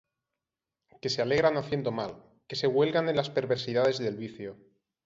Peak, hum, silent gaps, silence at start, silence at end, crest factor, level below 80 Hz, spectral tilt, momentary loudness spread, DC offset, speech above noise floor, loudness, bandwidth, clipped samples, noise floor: -10 dBFS; none; none; 1.05 s; 0.5 s; 20 dB; -64 dBFS; -5.5 dB/octave; 13 LU; under 0.1%; 61 dB; -29 LUFS; 7.8 kHz; under 0.1%; -89 dBFS